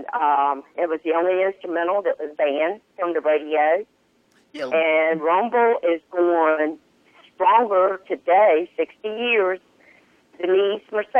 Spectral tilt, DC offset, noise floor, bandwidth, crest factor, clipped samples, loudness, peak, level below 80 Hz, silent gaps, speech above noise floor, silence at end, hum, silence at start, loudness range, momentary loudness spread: -6 dB/octave; under 0.1%; -61 dBFS; 6 kHz; 14 dB; under 0.1%; -21 LUFS; -6 dBFS; -76 dBFS; none; 41 dB; 0 s; none; 0 s; 3 LU; 9 LU